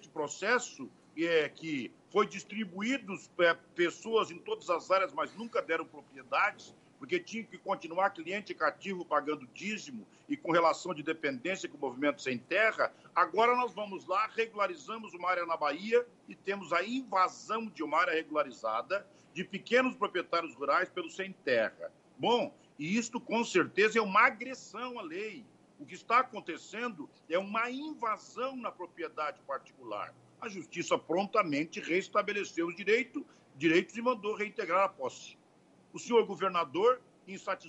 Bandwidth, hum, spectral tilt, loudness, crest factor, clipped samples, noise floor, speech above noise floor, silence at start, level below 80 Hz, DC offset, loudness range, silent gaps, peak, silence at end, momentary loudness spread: 8.6 kHz; none; -4 dB/octave; -33 LUFS; 22 dB; under 0.1%; -64 dBFS; 31 dB; 0 s; -84 dBFS; under 0.1%; 4 LU; none; -10 dBFS; 0 s; 14 LU